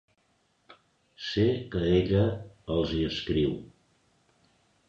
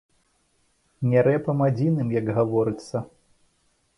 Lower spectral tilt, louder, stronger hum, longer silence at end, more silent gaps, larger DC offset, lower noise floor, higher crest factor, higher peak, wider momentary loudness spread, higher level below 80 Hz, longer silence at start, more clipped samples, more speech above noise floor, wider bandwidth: second, -7.5 dB/octave vs -9 dB/octave; second, -28 LUFS vs -23 LUFS; neither; first, 1.2 s vs 0.9 s; neither; neither; about the same, -70 dBFS vs -67 dBFS; about the same, 18 dB vs 16 dB; second, -12 dBFS vs -8 dBFS; about the same, 11 LU vs 12 LU; first, -46 dBFS vs -60 dBFS; second, 0.7 s vs 1 s; neither; about the same, 44 dB vs 45 dB; second, 7.6 kHz vs 11 kHz